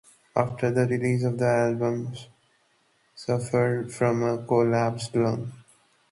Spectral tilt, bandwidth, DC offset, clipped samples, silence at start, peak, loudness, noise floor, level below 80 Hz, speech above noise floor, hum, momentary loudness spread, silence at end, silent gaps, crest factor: -7 dB/octave; 11.5 kHz; under 0.1%; under 0.1%; 0.35 s; -6 dBFS; -25 LUFS; -66 dBFS; -62 dBFS; 42 dB; none; 10 LU; 0.5 s; none; 20 dB